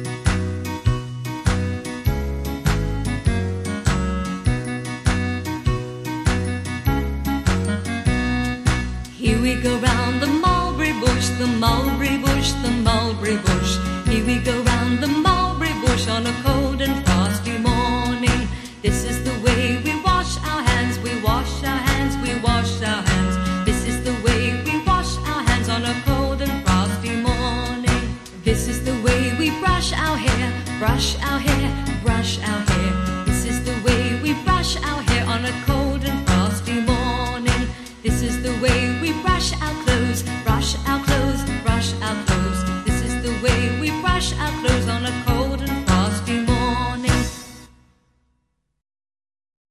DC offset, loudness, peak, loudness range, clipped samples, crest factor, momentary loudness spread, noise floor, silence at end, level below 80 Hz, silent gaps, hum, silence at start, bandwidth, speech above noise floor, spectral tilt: under 0.1%; -21 LUFS; -2 dBFS; 4 LU; under 0.1%; 18 dB; 5 LU; -71 dBFS; 2.05 s; -26 dBFS; none; none; 0 s; 15.5 kHz; 51 dB; -5 dB/octave